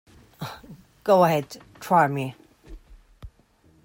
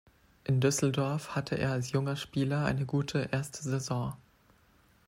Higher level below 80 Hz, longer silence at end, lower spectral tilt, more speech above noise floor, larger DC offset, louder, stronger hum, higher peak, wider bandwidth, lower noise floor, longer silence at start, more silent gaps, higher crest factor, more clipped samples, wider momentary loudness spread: first, -52 dBFS vs -60 dBFS; second, 0.6 s vs 0.9 s; about the same, -6.5 dB/octave vs -5.5 dB/octave; first, 38 dB vs 34 dB; neither; first, -22 LUFS vs -32 LUFS; neither; first, -6 dBFS vs -14 dBFS; about the same, 16.5 kHz vs 16 kHz; second, -59 dBFS vs -65 dBFS; about the same, 0.4 s vs 0.5 s; neither; about the same, 20 dB vs 18 dB; neither; first, 21 LU vs 7 LU